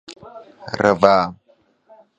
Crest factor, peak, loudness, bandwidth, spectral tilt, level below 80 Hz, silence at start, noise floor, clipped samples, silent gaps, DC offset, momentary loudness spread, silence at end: 20 dB; 0 dBFS; -17 LUFS; 8.8 kHz; -6 dB/octave; -54 dBFS; 0.1 s; -57 dBFS; under 0.1%; none; under 0.1%; 25 LU; 0.85 s